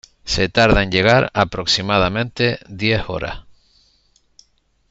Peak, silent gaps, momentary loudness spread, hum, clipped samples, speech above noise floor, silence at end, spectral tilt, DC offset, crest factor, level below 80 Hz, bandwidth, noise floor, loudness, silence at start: 0 dBFS; none; 11 LU; none; under 0.1%; 43 dB; 1.5 s; -5 dB/octave; under 0.1%; 18 dB; -34 dBFS; 8 kHz; -61 dBFS; -17 LUFS; 0.25 s